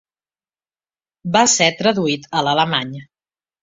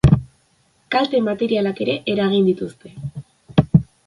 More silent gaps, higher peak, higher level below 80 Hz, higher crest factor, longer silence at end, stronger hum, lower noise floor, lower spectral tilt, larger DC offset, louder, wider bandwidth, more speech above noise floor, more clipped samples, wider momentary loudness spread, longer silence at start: neither; about the same, -2 dBFS vs 0 dBFS; second, -60 dBFS vs -36 dBFS; about the same, 18 dB vs 18 dB; first, 0.6 s vs 0.2 s; neither; first, under -90 dBFS vs -60 dBFS; second, -2.5 dB/octave vs -8 dB/octave; neither; first, -16 LUFS vs -19 LUFS; second, 8.2 kHz vs 11 kHz; first, over 73 dB vs 41 dB; neither; about the same, 17 LU vs 16 LU; first, 1.25 s vs 0.05 s